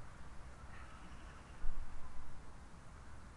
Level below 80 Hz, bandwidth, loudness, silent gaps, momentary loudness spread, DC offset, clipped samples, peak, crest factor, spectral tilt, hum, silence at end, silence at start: -48 dBFS; 10.5 kHz; -55 LUFS; none; 6 LU; under 0.1%; under 0.1%; -22 dBFS; 18 dB; -5 dB/octave; none; 0 s; 0 s